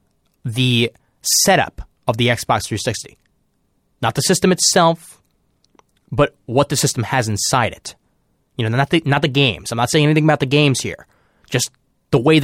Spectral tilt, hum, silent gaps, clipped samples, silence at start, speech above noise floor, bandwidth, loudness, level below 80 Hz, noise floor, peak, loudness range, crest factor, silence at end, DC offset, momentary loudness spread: -4 dB/octave; none; none; under 0.1%; 0.45 s; 48 dB; 16.5 kHz; -17 LUFS; -46 dBFS; -65 dBFS; -2 dBFS; 3 LU; 18 dB; 0 s; under 0.1%; 13 LU